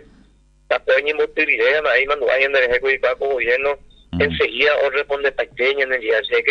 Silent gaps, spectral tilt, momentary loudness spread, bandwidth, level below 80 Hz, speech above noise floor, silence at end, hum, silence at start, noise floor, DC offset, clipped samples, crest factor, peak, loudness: none; -5 dB/octave; 6 LU; 7 kHz; -46 dBFS; 35 dB; 0 s; none; 0.7 s; -53 dBFS; under 0.1%; under 0.1%; 16 dB; -2 dBFS; -18 LUFS